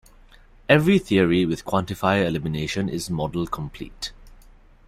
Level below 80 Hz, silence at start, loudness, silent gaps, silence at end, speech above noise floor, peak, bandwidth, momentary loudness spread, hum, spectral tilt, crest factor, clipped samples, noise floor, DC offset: -46 dBFS; 0.7 s; -22 LUFS; none; 0.55 s; 28 dB; -2 dBFS; 15.5 kHz; 15 LU; none; -6 dB/octave; 20 dB; under 0.1%; -50 dBFS; under 0.1%